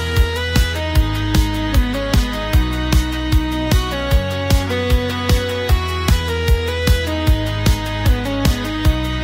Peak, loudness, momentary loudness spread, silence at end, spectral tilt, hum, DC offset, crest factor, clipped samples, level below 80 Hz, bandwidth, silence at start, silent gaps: -2 dBFS; -18 LUFS; 1 LU; 0 s; -5.5 dB/octave; none; under 0.1%; 14 dB; under 0.1%; -20 dBFS; 16.5 kHz; 0 s; none